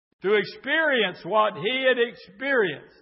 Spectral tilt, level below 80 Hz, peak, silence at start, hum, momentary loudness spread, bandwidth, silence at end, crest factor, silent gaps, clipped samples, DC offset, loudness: -8.5 dB/octave; -74 dBFS; -10 dBFS; 0.25 s; none; 5 LU; 5.8 kHz; 0.2 s; 16 dB; none; under 0.1%; under 0.1%; -23 LUFS